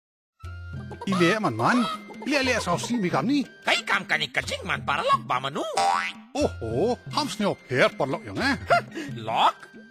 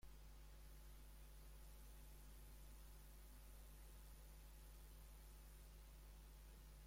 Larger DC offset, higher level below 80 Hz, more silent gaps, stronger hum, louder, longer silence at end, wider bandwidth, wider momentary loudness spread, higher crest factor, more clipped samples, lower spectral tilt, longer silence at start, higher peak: neither; first, -50 dBFS vs -62 dBFS; neither; neither; first, -25 LUFS vs -64 LUFS; about the same, 0.05 s vs 0 s; about the same, 16 kHz vs 16.5 kHz; first, 10 LU vs 1 LU; first, 20 dB vs 12 dB; neither; about the same, -4.5 dB/octave vs -4 dB/octave; first, 0.45 s vs 0 s; first, -6 dBFS vs -50 dBFS